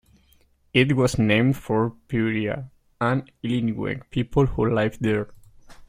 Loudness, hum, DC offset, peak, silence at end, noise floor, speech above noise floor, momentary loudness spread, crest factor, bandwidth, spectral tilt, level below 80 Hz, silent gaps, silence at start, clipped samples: -23 LUFS; none; under 0.1%; -4 dBFS; 0.05 s; -60 dBFS; 38 dB; 9 LU; 20 dB; 15.5 kHz; -6.5 dB/octave; -44 dBFS; none; 0.75 s; under 0.1%